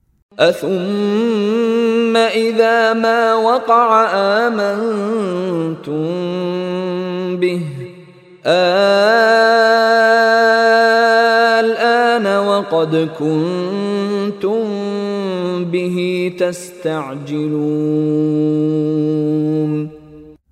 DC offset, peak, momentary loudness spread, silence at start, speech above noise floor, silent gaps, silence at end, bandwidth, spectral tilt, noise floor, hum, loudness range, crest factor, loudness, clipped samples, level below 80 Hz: under 0.1%; 0 dBFS; 10 LU; 0.4 s; 26 dB; none; 0.2 s; 14 kHz; -6 dB/octave; -41 dBFS; none; 8 LU; 14 dB; -15 LUFS; under 0.1%; -64 dBFS